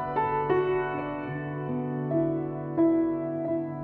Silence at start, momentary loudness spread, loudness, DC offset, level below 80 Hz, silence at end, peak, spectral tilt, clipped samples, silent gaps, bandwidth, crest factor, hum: 0 s; 8 LU; -28 LUFS; under 0.1%; -56 dBFS; 0 s; -14 dBFS; -11 dB/octave; under 0.1%; none; 4 kHz; 14 dB; none